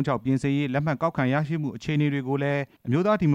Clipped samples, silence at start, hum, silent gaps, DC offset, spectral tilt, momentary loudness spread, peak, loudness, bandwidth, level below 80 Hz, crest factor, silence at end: under 0.1%; 0 s; none; none; under 0.1%; -8 dB/octave; 4 LU; -10 dBFS; -25 LUFS; 9.6 kHz; -56 dBFS; 14 dB; 0 s